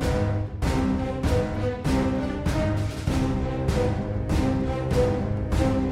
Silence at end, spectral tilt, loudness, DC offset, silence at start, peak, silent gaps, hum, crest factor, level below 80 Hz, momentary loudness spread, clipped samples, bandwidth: 0 s; -7 dB/octave; -25 LUFS; under 0.1%; 0 s; -10 dBFS; none; none; 14 dB; -32 dBFS; 3 LU; under 0.1%; 15 kHz